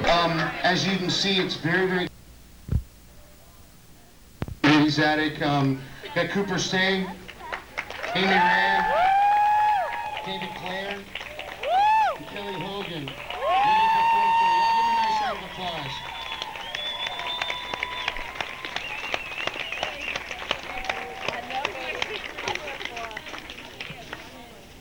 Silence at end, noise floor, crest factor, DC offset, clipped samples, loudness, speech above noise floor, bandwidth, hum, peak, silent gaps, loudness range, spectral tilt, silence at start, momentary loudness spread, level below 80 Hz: 0 s; -51 dBFS; 20 dB; 0.2%; under 0.1%; -25 LUFS; 27 dB; 19 kHz; none; -6 dBFS; none; 8 LU; -4.5 dB/octave; 0 s; 15 LU; -48 dBFS